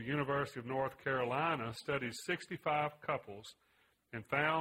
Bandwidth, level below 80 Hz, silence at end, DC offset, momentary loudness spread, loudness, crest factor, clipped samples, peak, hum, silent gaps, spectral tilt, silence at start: 16 kHz; -70 dBFS; 0 s; under 0.1%; 14 LU; -37 LUFS; 20 dB; under 0.1%; -18 dBFS; none; none; -5.5 dB/octave; 0 s